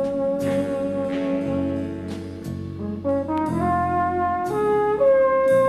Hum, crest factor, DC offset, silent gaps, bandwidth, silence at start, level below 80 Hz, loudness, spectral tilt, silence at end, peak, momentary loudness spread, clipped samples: none; 12 dB; under 0.1%; none; 13 kHz; 0 s; -48 dBFS; -23 LUFS; -7.5 dB/octave; 0 s; -10 dBFS; 13 LU; under 0.1%